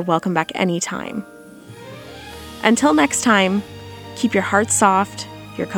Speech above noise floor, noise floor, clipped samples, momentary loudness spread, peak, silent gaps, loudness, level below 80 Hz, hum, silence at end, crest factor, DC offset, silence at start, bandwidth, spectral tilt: 22 dB; -40 dBFS; under 0.1%; 21 LU; 0 dBFS; none; -18 LUFS; -52 dBFS; none; 0 s; 20 dB; under 0.1%; 0 s; 19 kHz; -3.5 dB/octave